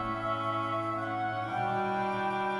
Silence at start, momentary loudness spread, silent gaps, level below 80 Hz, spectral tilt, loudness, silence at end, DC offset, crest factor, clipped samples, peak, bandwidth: 0 s; 2 LU; none; -60 dBFS; -6.5 dB/octave; -32 LUFS; 0 s; under 0.1%; 12 dB; under 0.1%; -20 dBFS; 11.5 kHz